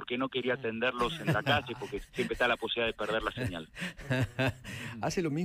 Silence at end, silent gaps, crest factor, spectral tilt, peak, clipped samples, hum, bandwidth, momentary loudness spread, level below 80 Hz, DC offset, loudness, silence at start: 0 s; none; 18 dB; -5 dB/octave; -14 dBFS; under 0.1%; none; 15.5 kHz; 10 LU; -54 dBFS; under 0.1%; -32 LUFS; 0 s